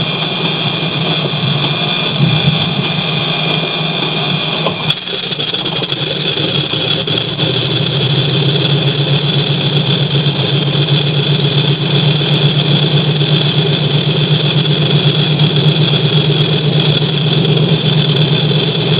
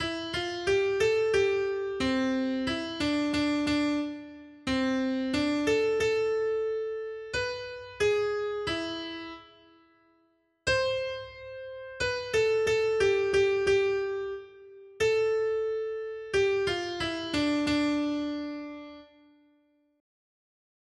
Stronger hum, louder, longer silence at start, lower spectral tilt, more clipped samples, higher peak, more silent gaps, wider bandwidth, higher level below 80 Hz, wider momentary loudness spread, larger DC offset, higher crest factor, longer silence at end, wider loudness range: neither; first, -12 LUFS vs -28 LUFS; about the same, 0 s vs 0 s; first, -10.5 dB/octave vs -4.5 dB/octave; neither; first, 0 dBFS vs -14 dBFS; neither; second, 4 kHz vs 11.5 kHz; first, -44 dBFS vs -56 dBFS; second, 3 LU vs 13 LU; neither; about the same, 12 dB vs 16 dB; second, 0 s vs 1.95 s; second, 3 LU vs 6 LU